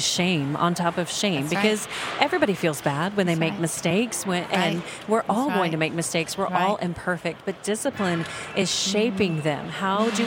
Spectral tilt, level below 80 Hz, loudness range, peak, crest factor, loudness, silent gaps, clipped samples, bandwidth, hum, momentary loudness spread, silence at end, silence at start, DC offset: -4 dB/octave; -60 dBFS; 2 LU; -4 dBFS; 20 dB; -24 LUFS; none; under 0.1%; 17 kHz; none; 5 LU; 0 s; 0 s; under 0.1%